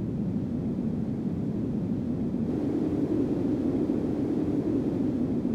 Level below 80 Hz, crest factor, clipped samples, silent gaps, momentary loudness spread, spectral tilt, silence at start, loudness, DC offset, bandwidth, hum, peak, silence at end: -48 dBFS; 14 dB; under 0.1%; none; 3 LU; -10 dB/octave; 0 s; -29 LUFS; under 0.1%; 8.4 kHz; none; -14 dBFS; 0 s